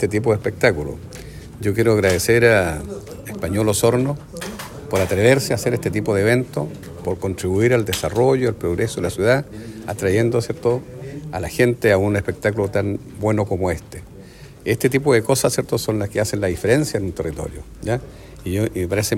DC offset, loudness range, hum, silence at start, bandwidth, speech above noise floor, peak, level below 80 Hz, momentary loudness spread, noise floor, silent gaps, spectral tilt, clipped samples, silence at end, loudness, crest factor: under 0.1%; 3 LU; none; 0 s; 16.5 kHz; 21 dB; 0 dBFS; -42 dBFS; 15 LU; -40 dBFS; none; -5.5 dB/octave; under 0.1%; 0 s; -20 LUFS; 18 dB